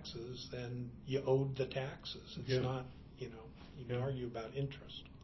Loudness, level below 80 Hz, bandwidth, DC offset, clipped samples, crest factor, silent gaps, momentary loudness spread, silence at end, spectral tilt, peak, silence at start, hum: -41 LUFS; -60 dBFS; 6.2 kHz; under 0.1%; under 0.1%; 20 dB; none; 15 LU; 0 s; -7 dB/octave; -20 dBFS; 0 s; none